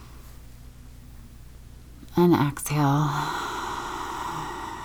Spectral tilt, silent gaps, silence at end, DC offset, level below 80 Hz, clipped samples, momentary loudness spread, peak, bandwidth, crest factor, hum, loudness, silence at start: -6 dB/octave; none; 0 s; under 0.1%; -46 dBFS; under 0.1%; 26 LU; -8 dBFS; over 20 kHz; 18 dB; none; -26 LUFS; 0 s